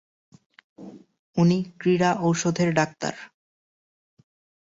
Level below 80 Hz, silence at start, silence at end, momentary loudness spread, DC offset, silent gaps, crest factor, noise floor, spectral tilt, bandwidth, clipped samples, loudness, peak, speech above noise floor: -64 dBFS; 0.8 s; 1.4 s; 23 LU; under 0.1%; 1.19-1.33 s; 20 dB; under -90 dBFS; -6 dB/octave; 7.8 kHz; under 0.1%; -23 LUFS; -6 dBFS; over 68 dB